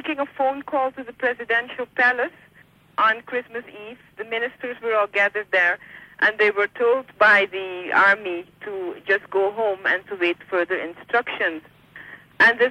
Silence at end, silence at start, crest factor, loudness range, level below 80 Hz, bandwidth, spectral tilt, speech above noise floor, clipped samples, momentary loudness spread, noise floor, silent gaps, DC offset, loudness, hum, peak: 0 s; 0.05 s; 16 dB; 5 LU; -68 dBFS; 14.5 kHz; -4 dB/octave; 32 dB; under 0.1%; 15 LU; -54 dBFS; none; under 0.1%; -21 LUFS; none; -6 dBFS